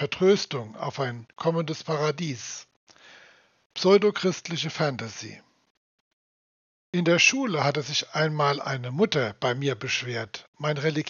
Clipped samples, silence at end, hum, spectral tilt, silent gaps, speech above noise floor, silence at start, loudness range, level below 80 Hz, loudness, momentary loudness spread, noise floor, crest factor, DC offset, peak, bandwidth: under 0.1%; 0 s; none; -3.5 dB/octave; 2.76-2.87 s, 3.66-3.70 s, 5.70-6.93 s, 10.48-10.53 s; 31 dB; 0 s; 5 LU; -74 dBFS; -25 LUFS; 14 LU; -56 dBFS; 20 dB; under 0.1%; -6 dBFS; 7.2 kHz